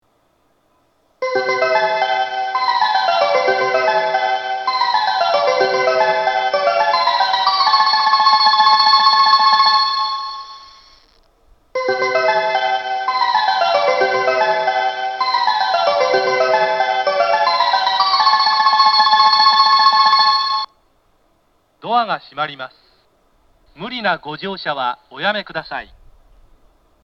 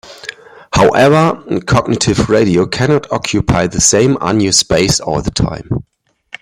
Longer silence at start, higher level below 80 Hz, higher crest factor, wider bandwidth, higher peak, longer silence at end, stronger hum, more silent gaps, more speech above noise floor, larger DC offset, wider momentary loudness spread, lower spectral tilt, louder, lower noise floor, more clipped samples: first, 1.2 s vs 0.05 s; second, -60 dBFS vs -32 dBFS; about the same, 16 dB vs 12 dB; second, 7.2 kHz vs 16 kHz; about the same, 0 dBFS vs 0 dBFS; first, 1.2 s vs 0.6 s; neither; neither; first, 38 dB vs 20 dB; neither; about the same, 13 LU vs 11 LU; second, -2 dB/octave vs -4.5 dB/octave; second, -15 LUFS vs -12 LUFS; first, -61 dBFS vs -32 dBFS; neither